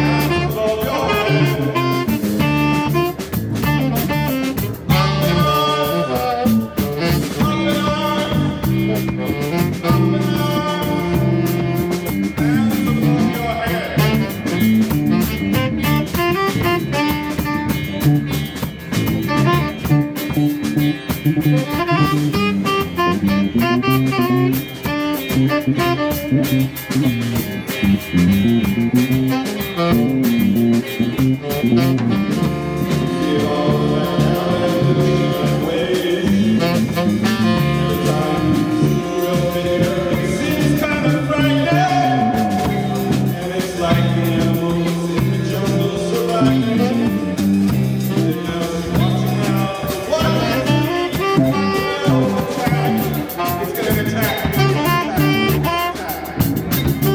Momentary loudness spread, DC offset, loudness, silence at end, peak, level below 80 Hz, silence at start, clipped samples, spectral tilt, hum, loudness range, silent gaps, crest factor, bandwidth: 5 LU; under 0.1%; -17 LUFS; 0 s; -2 dBFS; -38 dBFS; 0 s; under 0.1%; -6.5 dB/octave; none; 2 LU; none; 14 dB; 18.5 kHz